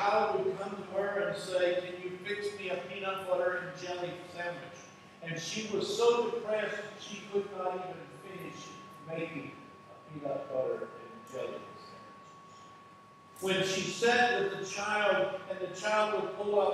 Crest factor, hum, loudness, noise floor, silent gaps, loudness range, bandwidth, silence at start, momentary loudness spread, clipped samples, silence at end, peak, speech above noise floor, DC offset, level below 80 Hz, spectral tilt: 20 dB; none; -33 LUFS; -56 dBFS; none; 10 LU; 14 kHz; 0 s; 21 LU; under 0.1%; 0 s; -14 dBFS; 23 dB; under 0.1%; -82 dBFS; -3.5 dB/octave